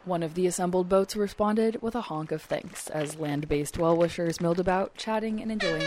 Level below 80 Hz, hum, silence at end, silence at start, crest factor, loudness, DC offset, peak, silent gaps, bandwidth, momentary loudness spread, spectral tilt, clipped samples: -50 dBFS; none; 0 s; 0.05 s; 16 dB; -28 LUFS; under 0.1%; -12 dBFS; none; 16 kHz; 8 LU; -5.5 dB/octave; under 0.1%